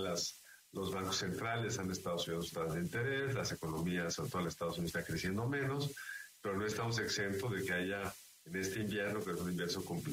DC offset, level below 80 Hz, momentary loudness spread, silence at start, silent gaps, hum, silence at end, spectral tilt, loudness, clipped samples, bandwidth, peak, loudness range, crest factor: under 0.1%; -64 dBFS; 5 LU; 0 s; none; none; 0 s; -4.5 dB/octave; -39 LUFS; under 0.1%; 16 kHz; -26 dBFS; 1 LU; 14 dB